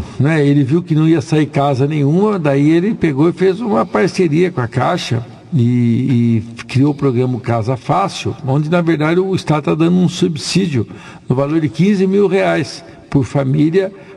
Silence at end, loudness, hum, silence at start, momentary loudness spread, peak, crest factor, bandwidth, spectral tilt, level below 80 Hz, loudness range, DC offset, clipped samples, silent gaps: 0 s; -15 LUFS; none; 0 s; 6 LU; -2 dBFS; 12 dB; 11.5 kHz; -7 dB/octave; -46 dBFS; 2 LU; under 0.1%; under 0.1%; none